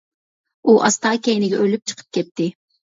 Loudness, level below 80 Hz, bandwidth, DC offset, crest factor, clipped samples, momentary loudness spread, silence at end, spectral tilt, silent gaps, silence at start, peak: -19 LUFS; -68 dBFS; 7.8 kHz; under 0.1%; 18 dB; under 0.1%; 11 LU; 0.45 s; -4 dB/octave; 2.31-2.35 s; 0.65 s; 0 dBFS